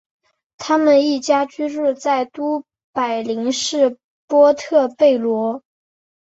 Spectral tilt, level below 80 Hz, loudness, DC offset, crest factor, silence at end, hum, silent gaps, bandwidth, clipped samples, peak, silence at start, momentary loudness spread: -3.5 dB/octave; -66 dBFS; -18 LUFS; under 0.1%; 16 dB; 0.6 s; none; 2.84-2.93 s, 4.04-4.28 s; 8.2 kHz; under 0.1%; -2 dBFS; 0.6 s; 10 LU